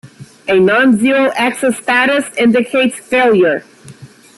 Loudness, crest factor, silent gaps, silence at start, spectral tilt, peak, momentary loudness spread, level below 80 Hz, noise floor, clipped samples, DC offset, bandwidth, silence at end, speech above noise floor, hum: -12 LUFS; 10 dB; none; 0.05 s; -4.5 dB/octave; -2 dBFS; 5 LU; -56 dBFS; -37 dBFS; under 0.1%; under 0.1%; 12.5 kHz; 0.3 s; 26 dB; none